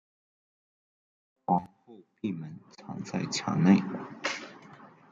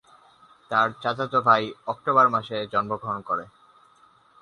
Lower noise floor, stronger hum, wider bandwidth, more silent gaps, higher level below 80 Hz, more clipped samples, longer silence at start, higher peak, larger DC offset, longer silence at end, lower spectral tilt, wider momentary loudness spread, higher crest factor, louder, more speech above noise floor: second, -53 dBFS vs -58 dBFS; neither; second, 7.8 kHz vs 10 kHz; neither; second, -72 dBFS vs -66 dBFS; neither; first, 1.5 s vs 0.7 s; second, -10 dBFS vs -4 dBFS; neither; second, 0.25 s vs 0.95 s; about the same, -5.5 dB/octave vs -6 dB/octave; first, 23 LU vs 11 LU; about the same, 22 dB vs 20 dB; second, -30 LUFS vs -23 LUFS; second, 23 dB vs 34 dB